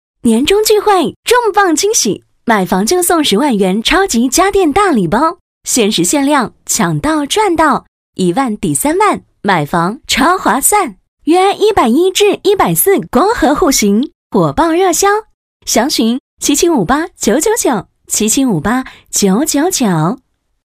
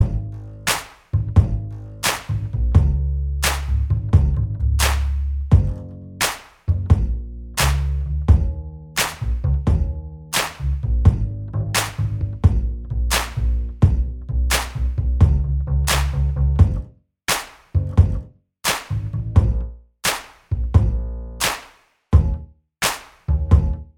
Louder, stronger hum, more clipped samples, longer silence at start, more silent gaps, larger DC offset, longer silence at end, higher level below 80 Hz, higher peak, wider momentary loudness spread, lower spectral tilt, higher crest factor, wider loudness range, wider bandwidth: first, -11 LUFS vs -21 LUFS; neither; neither; first, 0.25 s vs 0 s; first, 1.16-1.23 s, 5.41-5.61 s, 7.88-8.13 s, 11.08-11.17 s, 14.15-14.30 s, 15.34-15.60 s, 16.20-16.37 s vs none; neither; first, 0.65 s vs 0.15 s; second, -38 dBFS vs -24 dBFS; about the same, 0 dBFS vs 0 dBFS; second, 6 LU vs 10 LU; about the same, -3.5 dB/octave vs -4.5 dB/octave; second, 12 dB vs 18 dB; about the same, 2 LU vs 2 LU; second, 16 kHz vs 19 kHz